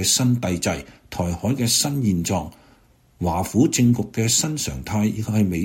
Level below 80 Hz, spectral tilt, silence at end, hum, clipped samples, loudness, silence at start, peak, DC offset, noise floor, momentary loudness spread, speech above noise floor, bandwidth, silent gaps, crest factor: -44 dBFS; -4.5 dB/octave; 0 s; none; under 0.1%; -21 LUFS; 0 s; -6 dBFS; under 0.1%; -55 dBFS; 9 LU; 34 dB; 16.5 kHz; none; 16 dB